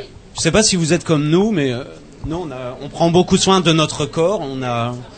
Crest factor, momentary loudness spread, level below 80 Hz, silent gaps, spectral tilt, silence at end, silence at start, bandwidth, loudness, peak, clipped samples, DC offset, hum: 18 dB; 15 LU; -40 dBFS; none; -4.5 dB/octave; 0 s; 0 s; 9.2 kHz; -16 LUFS; 0 dBFS; under 0.1%; under 0.1%; none